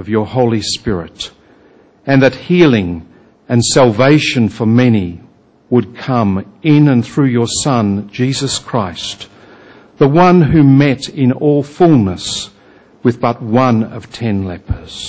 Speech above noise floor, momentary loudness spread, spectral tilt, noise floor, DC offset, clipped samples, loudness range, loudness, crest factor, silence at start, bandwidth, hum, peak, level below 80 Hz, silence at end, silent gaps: 34 dB; 14 LU; -6 dB/octave; -46 dBFS; under 0.1%; under 0.1%; 3 LU; -13 LUFS; 12 dB; 0 s; 8 kHz; none; 0 dBFS; -38 dBFS; 0 s; none